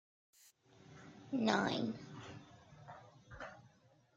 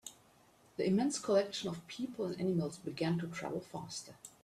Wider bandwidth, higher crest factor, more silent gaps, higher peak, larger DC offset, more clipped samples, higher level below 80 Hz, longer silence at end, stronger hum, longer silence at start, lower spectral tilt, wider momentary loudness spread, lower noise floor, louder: about the same, 14.5 kHz vs 14 kHz; first, 26 dB vs 20 dB; neither; about the same, -18 dBFS vs -18 dBFS; neither; neither; about the same, -74 dBFS vs -74 dBFS; first, 0.5 s vs 0.15 s; neither; first, 0.9 s vs 0.05 s; about the same, -5 dB/octave vs -5.5 dB/octave; first, 25 LU vs 13 LU; about the same, -69 dBFS vs -66 dBFS; about the same, -39 LUFS vs -37 LUFS